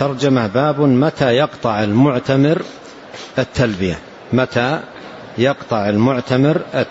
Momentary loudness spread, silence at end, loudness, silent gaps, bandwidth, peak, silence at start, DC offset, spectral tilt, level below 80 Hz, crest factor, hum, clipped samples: 15 LU; 0 s; -16 LUFS; none; 8 kHz; -2 dBFS; 0 s; under 0.1%; -7 dB/octave; -46 dBFS; 14 dB; none; under 0.1%